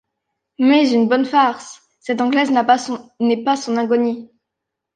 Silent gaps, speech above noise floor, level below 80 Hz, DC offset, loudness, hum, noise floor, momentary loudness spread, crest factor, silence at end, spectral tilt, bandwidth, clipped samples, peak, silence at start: none; 64 dB; -70 dBFS; under 0.1%; -17 LUFS; none; -81 dBFS; 14 LU; 16 dB; 0.7 s; -4.5 dB/octave; 9.4 kHz; under 0.1%; -2 dBFS; 0.6 s